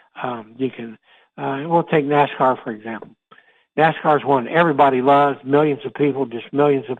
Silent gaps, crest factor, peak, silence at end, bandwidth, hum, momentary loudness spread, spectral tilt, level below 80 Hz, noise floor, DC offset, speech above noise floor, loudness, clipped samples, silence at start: none; 16 dB; -2 dBFS; 0.05 s; 4.3 kHz; none; 14 LU; -8.5 dB/octave; -66 dBFS; -53 dBFS; under 0.1%; 35 dB; -18 LUFS; under 0.1%; 0.15 s